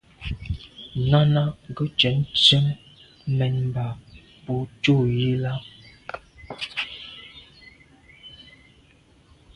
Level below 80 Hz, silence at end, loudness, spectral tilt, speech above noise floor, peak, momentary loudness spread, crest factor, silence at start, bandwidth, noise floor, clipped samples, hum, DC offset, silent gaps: -46 dBFS; 1.15 s; -22 LUFS; -6 dB/octave; 35 dB; -2 dBFS; 24 LU; 22 dB; 0.2 s; 10 kHz; -56 dBFS; under 0.1%; none; under 0.1%; none